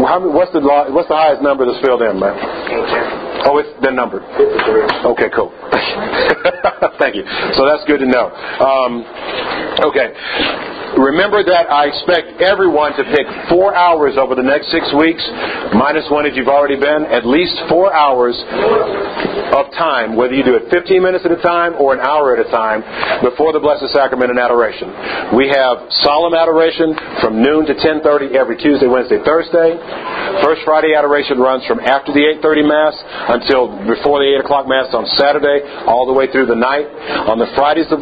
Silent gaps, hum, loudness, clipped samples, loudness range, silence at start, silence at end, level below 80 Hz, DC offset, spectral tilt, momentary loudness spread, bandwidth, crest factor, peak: none; none; -13 LUFS; under 0.1%; 2 LU; 0 s; 0 s; -46 dBFS; under 0.1%; -7 dB/octave; 6 LU; 5 kHz; 12 dB; 0 dBFS